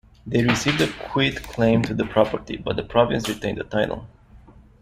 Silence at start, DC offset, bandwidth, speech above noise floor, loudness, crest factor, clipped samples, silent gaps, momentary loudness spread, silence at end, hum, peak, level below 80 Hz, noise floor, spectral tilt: 0.25 s; under 0.1%; 15.5 kHz; 26 dB; -22 LUFS; 20 dB; under 0.1%; none; 8 LU; 0.3 s; none; -2 dBFS; -44 dBFS; -48 dBFS; -5.5 dB/octave